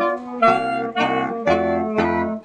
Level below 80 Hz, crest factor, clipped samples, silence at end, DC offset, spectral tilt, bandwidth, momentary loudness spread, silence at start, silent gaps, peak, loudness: -50 dBFS; 16 dB; under 0.1%; 0 s; under 0.1%; -6 dB/octave; 9.4 kHz; 4 LU; 0 s; none; -4 dBFS; -20 LUFS